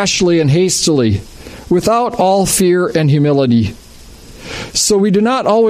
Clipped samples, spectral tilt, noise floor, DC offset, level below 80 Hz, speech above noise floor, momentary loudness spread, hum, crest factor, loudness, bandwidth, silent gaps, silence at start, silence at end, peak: under 0.1%; -5 dB/octave; -36 dBFS; under 0.1%; -40 dBFS; 24 dB; 11 LU; none; 12 dB; -12 LUFS; 15.5 kHz; none; 0 s; 0 s; -2 dBFS